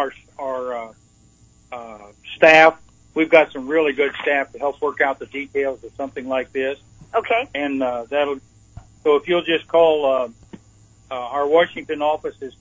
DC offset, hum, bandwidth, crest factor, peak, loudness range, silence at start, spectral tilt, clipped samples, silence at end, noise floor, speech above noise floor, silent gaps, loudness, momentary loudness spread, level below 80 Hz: under 0.1%; none; 7.8 kHz; 20 dB; 0 dBFS; 7 LU; 0 s; -4.5 dB/octave; under 0.1%; 0.1 s; -53 dBFS; 35 dB; none; -19 LUFS; 17 LU; -56 dBFS